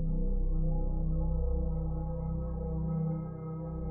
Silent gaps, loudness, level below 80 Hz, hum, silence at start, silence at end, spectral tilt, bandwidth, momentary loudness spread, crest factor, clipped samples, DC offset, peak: none; -35 LUFS; -32 dBFS; none; 0 s; 0 s; -12.5 dB/octave; 1.6 kHz; 5 LU; 10 dB; under 0.1%; under 0.1%; -20 dBFS